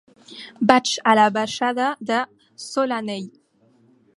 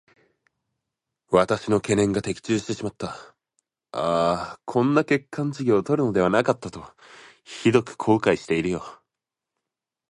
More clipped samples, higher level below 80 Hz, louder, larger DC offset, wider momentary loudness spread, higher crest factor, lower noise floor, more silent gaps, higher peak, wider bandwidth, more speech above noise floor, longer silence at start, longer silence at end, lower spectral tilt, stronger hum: neither; second, -66 dBFS vs -54 dBFS; first, -20 LUFS vs -23 LUFS; neither; first, 22 LU vs 14 LU; about the same, 22 dB vs 20 dB; second, -58 dBFS vs -87 dBFS; neither; first, 0 dBFS vs -4 dBFS; about the same, 11.5 kHz vs 11.5 kHz; second, 38 dB vs 64 dB; second, 0.3 s vs 1.3 s; second, 0.85 s vs 1.15 s; second, -3.5 dB/octave vs -6 dB/octave; neither